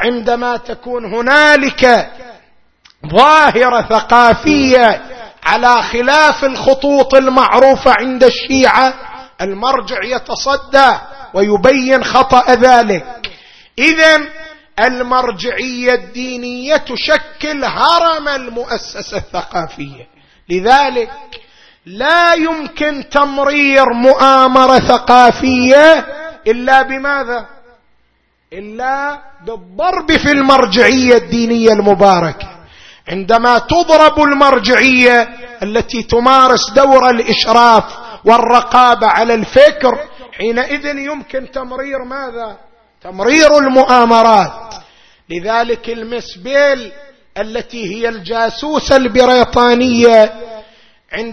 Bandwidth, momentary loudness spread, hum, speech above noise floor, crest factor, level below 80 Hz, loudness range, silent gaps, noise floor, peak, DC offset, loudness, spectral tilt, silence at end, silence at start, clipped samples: 11 kHz; 16 LU; none; 47 dB; 12 dB; -38 dBFS; 8 LU; none; -58 dBFS; 0 dBFS; under 0.1%; -10 LUFS; -4 dB/octave; 0 s; 0 s; 1%